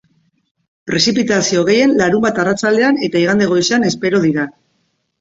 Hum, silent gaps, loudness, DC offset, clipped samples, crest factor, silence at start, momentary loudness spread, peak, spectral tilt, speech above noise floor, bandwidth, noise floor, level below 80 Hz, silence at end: none; none; -14 LUFS; under 0.1%; under 0.1%; 14 dB; 0.85 s; 5 LU; 0 dBFS; -4.5 dB/octave; 51 dB; 8 kHz; -65 dBFS; -52 dBFS; 0.7 s